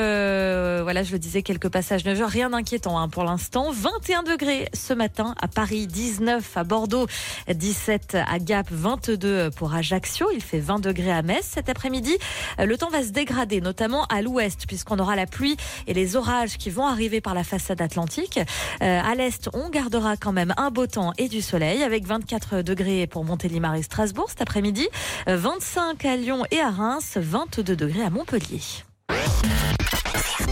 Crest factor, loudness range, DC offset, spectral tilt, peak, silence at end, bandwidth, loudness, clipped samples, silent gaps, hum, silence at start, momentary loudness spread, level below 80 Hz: 12 dB; 1 LU; under 0.1%; -4.5 dB/octave; -12 dBFS; 0 s; 16.5 kHz; -24 LUFS; under 0.1%; none; none; 0 s; 4 LU; -38 dBFS